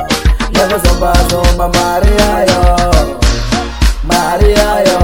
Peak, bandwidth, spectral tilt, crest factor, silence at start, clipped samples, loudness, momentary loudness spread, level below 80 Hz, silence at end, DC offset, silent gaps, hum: 0 dBFS; 17.5 kHz; -4.5 dB/octave; 10 dB; 0 s; 0.9%; -11 LUFS; 4 LU; -14 dBFS; 0 s; 2%; none; none